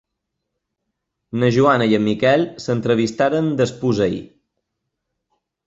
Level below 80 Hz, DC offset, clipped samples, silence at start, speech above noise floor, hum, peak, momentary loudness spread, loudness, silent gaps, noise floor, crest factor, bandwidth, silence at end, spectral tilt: -54 dBFS; under 0.1%; under 0.1%; 1.35 s; 61 dB; none; -2 dBFS; 7 LU; -18 LUFS; none; -78 dBFS; 18 dB; 8 kHz; 1.4 s; -6.5 dB/octave